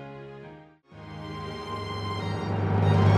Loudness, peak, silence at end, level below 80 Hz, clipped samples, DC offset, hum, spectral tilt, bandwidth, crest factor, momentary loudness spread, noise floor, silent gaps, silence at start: -29 LUFS; -10 dBFS; 0 s; -52 dBFS; under 0.1%; under 0.1%; none; -8 dB/octave; 7.8 kHz; 18 dB; 22 LU; -49 dBFS; none; 0 s